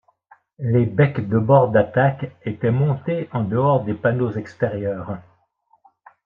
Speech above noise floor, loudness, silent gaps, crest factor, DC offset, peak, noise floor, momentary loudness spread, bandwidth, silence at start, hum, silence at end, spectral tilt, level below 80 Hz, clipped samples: 43 dB; -20 LUFS; none; 18 dB; under 0.1%; -2 dBFS; -62 dBFS; 14 LU; 4.7 kHz; 0.6 s; none; 1.05 s; -10.5 dB/octave; -60 dBFS; under 0.1%